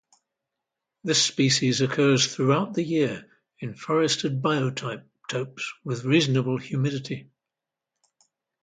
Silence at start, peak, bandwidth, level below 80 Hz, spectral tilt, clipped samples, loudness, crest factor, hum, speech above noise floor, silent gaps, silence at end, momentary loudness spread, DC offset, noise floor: 1.05 s; -8 dBFS; 9.6 kHz; -66 dBFS; -4.5 dB/octave; under 0.1%; -24 LUFS; 18 dB; none; 63 dB; none; 1.4 s; 15 LU; under 0.1%; -87 dBFS